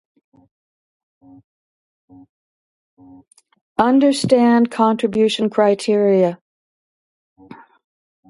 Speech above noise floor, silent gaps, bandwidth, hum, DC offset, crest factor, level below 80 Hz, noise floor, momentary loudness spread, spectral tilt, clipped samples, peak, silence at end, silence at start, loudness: over 74 dB; 6.41-7.36 s; 11.5 kHz; none; under 0.1%; 20 dB; -62 dBFS; under -90 dBFS; 6 LU; -5.5 dB/octave; under 0.1%; 0 dBFS; 0.75 s; 3.8 s; -16 LUFS